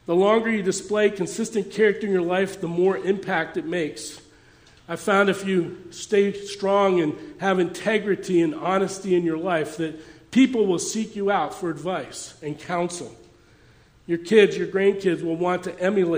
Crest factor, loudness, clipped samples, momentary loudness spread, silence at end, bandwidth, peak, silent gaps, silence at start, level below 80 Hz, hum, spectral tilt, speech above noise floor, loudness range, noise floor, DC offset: 20 dB; -23 LUFS; under 0.1%; 11 LU; 0 s; 16 kHz; -4 dBFS; none; 0.1 s; -62 dBFS; none; -5 dB/octave; 32 dB; 3 LU; -54 dBFS; under 0.1%